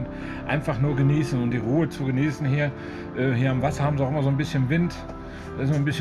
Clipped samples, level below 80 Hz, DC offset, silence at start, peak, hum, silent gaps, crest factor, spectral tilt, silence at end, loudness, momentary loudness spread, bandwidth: under 0.1%; -44 dBFS; under 0.1%; 0 s; -10 dBFS; none; none; 14 dB; -7.5 dB/octave; 0 s; -24 LUFS; 11 LU; 12 kHz